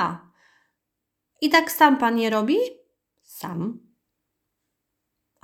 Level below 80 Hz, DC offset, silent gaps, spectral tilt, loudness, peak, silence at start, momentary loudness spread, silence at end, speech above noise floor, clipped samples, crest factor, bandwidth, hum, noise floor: -70 dBFS; under 0.1%; none; -4 dB/octave; -21 LUFS; -4 dBFS; 0 s; 18 LU; 1.65 s; 61 dB; under 0.1%; 22 dB; over 20 kHz; none; -81 dBFS